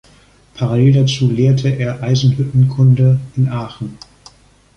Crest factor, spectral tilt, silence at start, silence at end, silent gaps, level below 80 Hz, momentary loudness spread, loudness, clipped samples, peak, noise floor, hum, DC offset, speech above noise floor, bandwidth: 12 dB; -7.5 dB/octave; 0.55 s; 0.8 s; none; -44 dBFS; 12 LU; -14 LUFS; under 0.1%; -2 dBFS; -48 dBFS; none; under 0.1%; 35 dB; 8 kHz